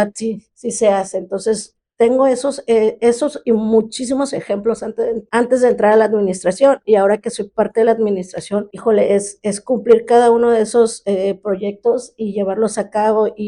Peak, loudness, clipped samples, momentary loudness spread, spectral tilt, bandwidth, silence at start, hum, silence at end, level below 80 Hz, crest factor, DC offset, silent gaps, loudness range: -2 dBFS; -16 LUFS; under 0.1%; 10 LU; -5 dB/octave; 11 kHz; 0 s; none; 0 s; -56 dBFS; 14 dB; under 0.1%; none; 2 LU